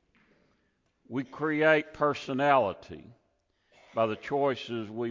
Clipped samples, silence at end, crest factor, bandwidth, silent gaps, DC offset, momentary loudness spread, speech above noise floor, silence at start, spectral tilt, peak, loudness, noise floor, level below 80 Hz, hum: under 0.1%; 0 s; 20 dB; 7.6 kHz; none; under 0.1%; 13 LU; 45 dB; 1.1 s; -6.5 dB/octave; -10 dBFS; -28 LUFS; -73 dBFS; -66 dBFS; none